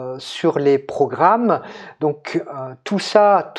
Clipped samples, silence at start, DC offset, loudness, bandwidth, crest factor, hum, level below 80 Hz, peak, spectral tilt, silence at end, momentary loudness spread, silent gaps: under 0.1%; 0 s; under 0.1%; -18 LUFS; 11 kHz; 18 dB; none; -70 dBFS; 0 dBFS; -6 dB/octave; 0 s; 14 LU; none